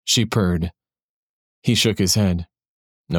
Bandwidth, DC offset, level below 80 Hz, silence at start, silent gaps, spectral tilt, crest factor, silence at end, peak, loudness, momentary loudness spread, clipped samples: 18 kHz; under 0.1%; -42 dBFS; 0.05 s; 1.03-1.62 s, 2.68-3.04 s; -4 dB/octave; 16 dB; 0 s; -4 dBFS; -20 LUFS; 11 LU; under 0.1%